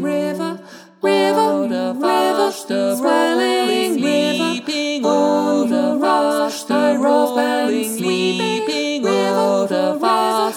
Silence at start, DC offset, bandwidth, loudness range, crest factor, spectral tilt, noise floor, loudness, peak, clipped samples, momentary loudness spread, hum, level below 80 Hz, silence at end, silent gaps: 0 s; under 0.1%; 18.5 kHz; 1 LU; 14 dB; -4 dB/octave; -37 dBFS; -17 LUFS; -2 dBFS; under 0.1%; 5 LU; none; -74 dBFS; 0 s; none